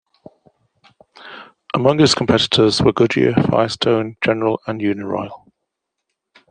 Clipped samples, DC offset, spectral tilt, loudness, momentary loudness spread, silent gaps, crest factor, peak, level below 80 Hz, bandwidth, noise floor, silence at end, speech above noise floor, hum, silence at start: under 0.1%; under 0.1%; -5 dB/octave; -16 LUFS; 18 LU; none; 16 dB; -2 dBFS; -50 dBFS; 10 kHz; -78 dBFS; 1.15 s; 62 dB; none; 1.2 s